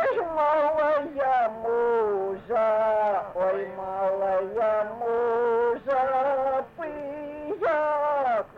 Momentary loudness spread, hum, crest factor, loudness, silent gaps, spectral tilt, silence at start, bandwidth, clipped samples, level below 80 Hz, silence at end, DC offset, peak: 8 LU; none; 10 dB; -25 LUFS; none; -6.5 dB/octave; 0 s; 6.8 kHz; under 0.1%; -60 dBFS; 0 s; under 0.1%; -16 dBFS